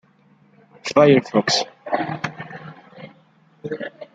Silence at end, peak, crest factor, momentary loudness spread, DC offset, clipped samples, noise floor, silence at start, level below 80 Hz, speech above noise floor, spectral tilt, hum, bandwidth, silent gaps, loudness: 0.1 s; -2 dBFS; 20 dB; 24 LU; under 0.1%; under 0.1%; -56 dBFS; 0.85 s; -64 dBFS; 39 dB; -4.5 dB/octave; none; 9.2 kHz; none; -19 LUFS